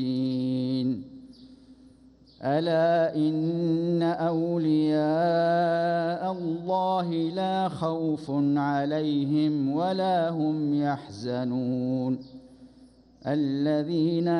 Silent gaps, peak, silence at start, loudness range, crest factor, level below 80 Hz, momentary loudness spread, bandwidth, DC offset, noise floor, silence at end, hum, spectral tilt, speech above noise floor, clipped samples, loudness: none; -14 dBFS; 0 s; 4 LU; 12 dB; -66 dBFS; 6 LU; 10 kHz; under 0.1%; -55 dBFS; 0 s; none; -8.5 dB/octave; 30 dB; under 0.1%; -26 LUFS